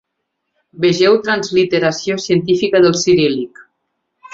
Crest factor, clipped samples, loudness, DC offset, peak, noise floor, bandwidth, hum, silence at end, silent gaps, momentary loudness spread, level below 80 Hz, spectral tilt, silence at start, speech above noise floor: 14 dB; under 0.1%; -14 LUFS; under 0.1%; -2 dBFS; -74 dBFS; 7.8 kHz; none; 0.05 s; none; 6 LU; -54 dBFS; -4.5 dB/octave; 0.75 s; 60 dB